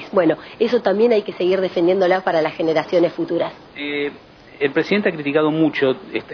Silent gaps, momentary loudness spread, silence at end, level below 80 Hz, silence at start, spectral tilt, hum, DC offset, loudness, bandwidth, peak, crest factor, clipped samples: none; 8 LU; 0 s; -60 dBFS; 0 s; -7 dB/octave; none; under 0.1%; -19 LUFS; 5.4 kHz; -4 dBFS; 16 dB; under 0.1%